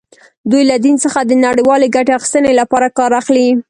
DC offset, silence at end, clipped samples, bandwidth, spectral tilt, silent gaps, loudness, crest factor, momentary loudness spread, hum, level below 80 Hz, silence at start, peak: under 0.1%; 0.1 s; under 0.1%; 11.5 kHz; -3.5 dB/octave; none; -11 LUFS; 12 dB; 3 LU; none; -52 dBFS; 0.45 s; 0 dBFS